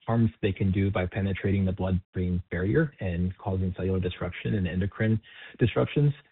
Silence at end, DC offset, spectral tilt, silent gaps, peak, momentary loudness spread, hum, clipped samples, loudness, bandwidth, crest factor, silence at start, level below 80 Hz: 0.1 s; under 0.1%; -7.5 dB/octave; 2.05-2.13 s; -10 dBFS; 5 LU; none; under 0.1%; -28 LUFS; 4.1 kHz; 16 dB; 0.05 s; -48 dBFS